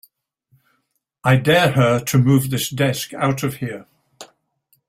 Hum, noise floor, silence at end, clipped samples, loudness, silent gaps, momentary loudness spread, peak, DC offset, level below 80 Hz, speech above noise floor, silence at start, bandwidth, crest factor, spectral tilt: none; -70 dBFS; 0.65 s; under 0.1%; -18 LUFS; none; 11 LU; -2 dBFS; under 0.1%; -54 dBFS; 53 dB; 1.25 s; 16 kHz; 18 dB; -5.5 dB/octave